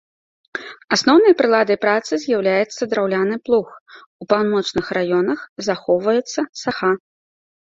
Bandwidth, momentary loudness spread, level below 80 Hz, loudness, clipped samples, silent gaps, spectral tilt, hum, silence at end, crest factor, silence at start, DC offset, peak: 7.8 kHz; 11 LU; -60 dBFS; -18 LUFS; under 0.1%; 3.81-3.86 s, 4.06-4.19 s, 5.49-5.56 s, 6.49-6.53 s; -4.5 dB/octave; none; 0.65 s; 18 dB; 0.55 s; under 0.1%; -2 dBFS